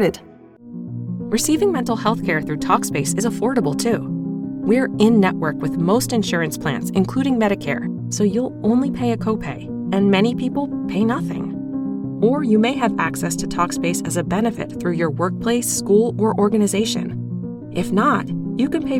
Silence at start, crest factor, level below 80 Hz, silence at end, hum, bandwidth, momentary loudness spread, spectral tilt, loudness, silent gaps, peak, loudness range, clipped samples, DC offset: 0 s; 18 dB; -48 dBFS; 0 s; none; 17 kHz; 9 LU; -5.5 dB/octave; -20 LUFS; none; -2 dBFS; 2 LU; under 0.1%; under 0.1%